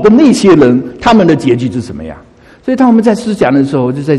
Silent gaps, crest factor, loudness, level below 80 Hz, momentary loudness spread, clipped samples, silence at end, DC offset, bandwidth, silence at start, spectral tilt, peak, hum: none; 8 dB; -9 LUFS; -38 dBFS; 15 LU; 0.9%; 0 s; under 0.1%; 12 kHz; 0 s; -6.5 dB/octave; 0 dBFS; none